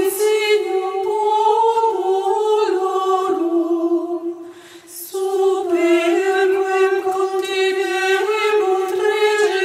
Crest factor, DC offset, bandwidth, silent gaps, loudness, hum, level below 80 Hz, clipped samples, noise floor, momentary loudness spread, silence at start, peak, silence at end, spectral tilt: 12 dB; under 0.1%; 16 kHz; none; -18 LUFS; none; -78 dBFS; under 0.1%; -39 dBFS; 6 LU; 0 s; -4 dBFS; 0 s; -2 dB/octave